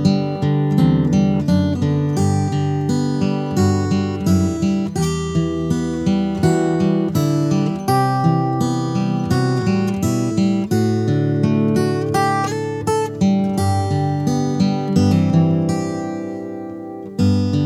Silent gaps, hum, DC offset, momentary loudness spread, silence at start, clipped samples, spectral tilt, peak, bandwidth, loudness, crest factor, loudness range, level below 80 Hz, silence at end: none; none; under 0.1%; 5 LU; 0 s; under 0.1%; -7 dB/octave; -4 dBFS; 15 kHz; -18 LUFS; 14 dB; 1 LU; -44 dBFS; 0 s